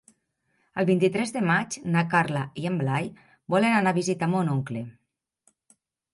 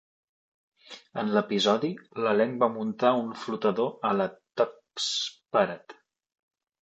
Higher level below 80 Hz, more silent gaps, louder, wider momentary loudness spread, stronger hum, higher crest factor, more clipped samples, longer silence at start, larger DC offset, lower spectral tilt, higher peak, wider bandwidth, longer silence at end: first, -68 dBFS vs -76 dBFS; neither; about the same, -25 LUFS vs -27 LUFS; about the same, 11 LU vs 9 LU; neither; about the same, 20 dB vs 22 dB; neither; second, 0.75 s vs 0.9 s; neither; first, -6 dB/octave vs -4.5 dB/octave; about the same, -8 dBFS vs -8 dBFS; first, 11.5 kHz vs 8.8 kHz; first, 1.25 s vs 1 s